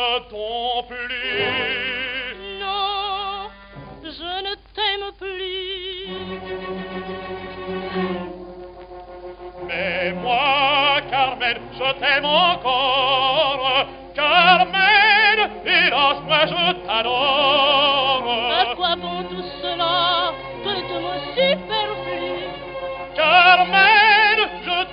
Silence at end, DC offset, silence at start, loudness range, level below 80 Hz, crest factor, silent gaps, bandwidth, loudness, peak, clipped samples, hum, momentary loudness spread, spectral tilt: 0 s; under 0.1%; 0 s; 12 LU; -48 dBFS; 20 dB; none; 5.6 kHz; -18 LUFS; 0 dBFS; under 0.1%; none; 17 LU; -6.5 dB/octave